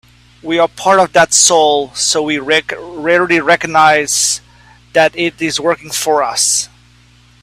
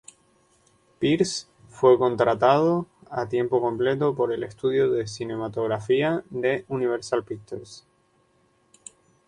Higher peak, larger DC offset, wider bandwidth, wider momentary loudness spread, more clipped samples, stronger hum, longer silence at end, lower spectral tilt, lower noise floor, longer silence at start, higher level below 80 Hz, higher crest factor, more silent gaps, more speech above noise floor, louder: first, 0 dBFS vs -4 dBFS; neither; first, 16 kHz vs 10.5 kHz; second, 9 LU vs 13 LU; neither; first, 60 Hz at -45 dBFS vs none; second, 0.75 s vs 1.5 s; second, -1.5 dB/octave vs -5.5 dB/octave; second, -46 dBFS vs -64 dBFS; second, 0.45 s vs 1 s; first, -50 dBFS vs -62 dBFS; second, 14 dB vs 20 dB; neither; second, 34 dB vs 41 dB; first, -12 LUFS vs -24 LUFS